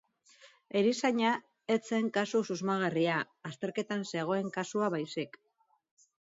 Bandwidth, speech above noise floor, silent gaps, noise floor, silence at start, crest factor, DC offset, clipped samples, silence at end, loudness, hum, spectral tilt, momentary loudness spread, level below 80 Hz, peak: 7.8 kHz; 30 dB; none; -61 dBFS; 0.45 s; 18 dB; under 0.1%; under 0.1%; 1 s; -32 LUFS; none; -5 dB/octave; 8 LU; -82 dBFS; -14 dBFS